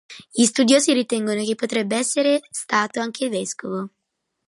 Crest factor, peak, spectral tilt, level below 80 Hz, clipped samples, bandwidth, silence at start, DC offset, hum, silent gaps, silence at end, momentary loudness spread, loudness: 18 dB; -4 dBFS; -3 dB/octave; -72 dBFS; under 0.1%; 11.5 kHz; 0.1 s; under 0.1%; none; none; 0.6 s; 12 LU; -21 LUFS